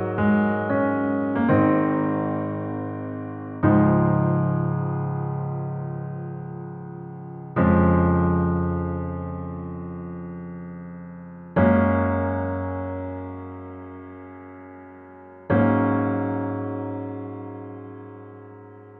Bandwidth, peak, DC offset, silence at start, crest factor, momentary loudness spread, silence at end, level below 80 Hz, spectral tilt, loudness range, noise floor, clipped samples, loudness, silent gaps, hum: 3.8 kHz; -6 dBFS; under 0.1%; 0 s; 18 dB; 21 LU; 0 s; -46 dBFS; -12.5 dB/octave; 6 LU; -44 dBFS; under 0.1%; -23 LUFS; none; none